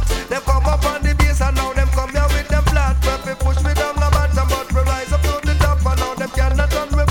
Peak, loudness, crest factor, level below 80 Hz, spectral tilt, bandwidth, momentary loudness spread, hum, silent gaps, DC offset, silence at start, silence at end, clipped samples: 0 dBFS; -18 LUFS; 16 dB; -18 dBFS; -5 dB/octave; 16.5 kHz; 4 LU; none; none; under 0.1%; 0 s; 0 s; under 0.1%